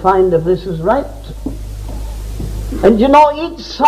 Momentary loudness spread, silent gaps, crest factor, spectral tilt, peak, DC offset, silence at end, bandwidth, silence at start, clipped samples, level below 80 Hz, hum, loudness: 18 LU; none; 14 dB; -7 dB/octave; 0 dBFS; under 0.1%; 0 s; 15.5 kHz; 0 s; under 0.1%; -26 dBFS; none; -13 LUFS